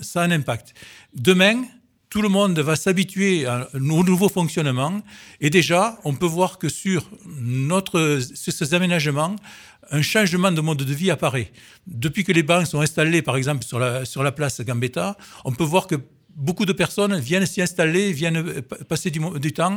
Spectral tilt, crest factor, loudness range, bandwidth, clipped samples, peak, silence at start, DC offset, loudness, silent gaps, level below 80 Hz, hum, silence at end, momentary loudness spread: -5 dB/octave; 20 dB; 2 LU; 18 kHz; under 0.1%; -2 dBFS; 0 s; under 0.1%; -21 LUFS; none; -56 dBFS; none; 0 s; 10 LU